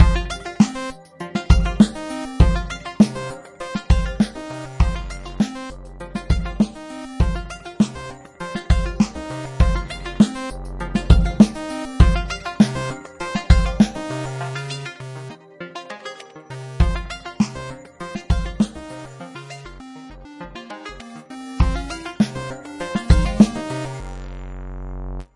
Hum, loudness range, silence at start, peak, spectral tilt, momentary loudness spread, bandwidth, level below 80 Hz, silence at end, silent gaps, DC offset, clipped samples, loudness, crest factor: none; 9 LU; 0 s; 0 dBFS; -6.5 dB/octave; 18 LU; 11.5 kHz; -24 dBFS; 0.1 s; none; under 0.1%; under 0.1%; -21 LUFS; 20 dB